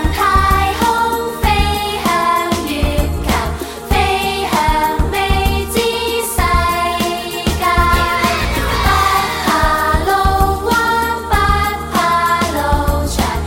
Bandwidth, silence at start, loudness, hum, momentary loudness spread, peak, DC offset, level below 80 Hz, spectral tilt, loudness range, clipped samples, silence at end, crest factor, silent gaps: 17 kHz; 0 s; -15 LUFS; none; 4 LU; 0 dBFS; under 0.1%; -22 dBFS; -4.5 dB/octave; 2 LU; under 0.1%; 0 s; 14 dB; none